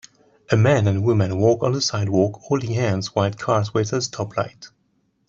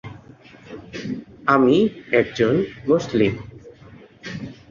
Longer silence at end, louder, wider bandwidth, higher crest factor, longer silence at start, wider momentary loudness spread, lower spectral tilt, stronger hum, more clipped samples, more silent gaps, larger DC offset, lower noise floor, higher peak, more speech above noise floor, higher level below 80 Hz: first, 0.6 s vs 0.15 s; about the same, -21 LUFS vs -20 LUFS; about the same, 7.6 kHz vs 7.4 kHz; about the same, 18 dB vs 20 dB; first, 0.5 s vs 0.05 s; second, 8 LU vs 22 LU; about the same, -6 dB/octave vs -7 dB/octave; neither; neither; neither; neither; first, -66 dBFS vs -46 dBFS; about the same, -4 dBFS vs -2 dBFS; first, 47 dB vs 27 dB; about the same, -54 dBFS vs -52 dBFS